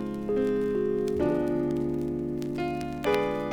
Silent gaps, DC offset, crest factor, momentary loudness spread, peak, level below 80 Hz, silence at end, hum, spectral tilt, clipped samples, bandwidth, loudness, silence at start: none; under 0.1%; 16 dB; 5 LU; -12 dBFS; -50 dBFS; 0 s; none; -7.5 dB/octave; under 0.1%; 19 kHz; -28 LUFS; 0 s